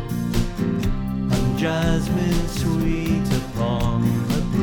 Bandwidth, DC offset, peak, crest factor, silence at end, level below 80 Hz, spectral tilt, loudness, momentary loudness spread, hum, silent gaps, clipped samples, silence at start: 20 kHz; under 0.1%; -6 dBFS; 14 dB; 0 s; -30 dBFS; -6.5 dB/octave; -22 LUFS; 3 LU; none; none; under 0.1%; 0 s